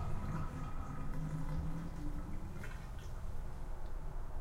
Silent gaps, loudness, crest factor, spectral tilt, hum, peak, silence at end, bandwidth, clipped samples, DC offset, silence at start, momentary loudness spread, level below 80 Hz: none; -45 LUFS; 12 dB; -7 dB/octave; none; -26 dBFS; 0 s; 12 kHz; under 0.1%; under 0.1%; 0 s; 7 LU; -42 dBFS